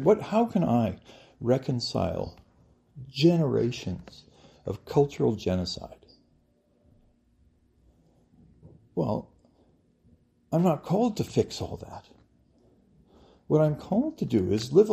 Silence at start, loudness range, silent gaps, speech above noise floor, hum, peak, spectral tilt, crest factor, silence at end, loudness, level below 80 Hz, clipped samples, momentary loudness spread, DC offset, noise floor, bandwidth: 0 s; 11 LU; none; 40 dB; none; -8 dBFS; -7 dB/octave; 20 dB; 0 s; -27 LUFS; -58 dBFS; under 0.1%; 16 LU; under 0.1%; -66 dBFS; 15 kHz